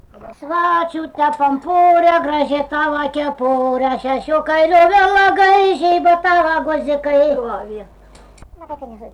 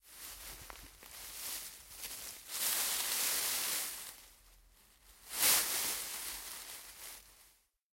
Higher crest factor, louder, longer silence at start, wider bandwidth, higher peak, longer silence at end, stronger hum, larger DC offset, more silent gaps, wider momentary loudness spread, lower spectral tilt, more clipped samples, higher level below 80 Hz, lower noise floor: second, 10 dB vs 24 dB; first, -15 LUFS vs -34 LUFS; first, 0.2 s vs 0.05 s; second, 10 kHz vs 16.5 kHz; first, -4 dBFS vs -16 dBFS; second, 0.05 s vs 0.45 s; neither; neither; neither; second, 14 LU vs 19 LU; first, -4.5 dB/octave vs 1.5 dB/octave; neither; first, -46 dBFS vs -66 dBFS; second, -41 dBFS vs -68 dBFS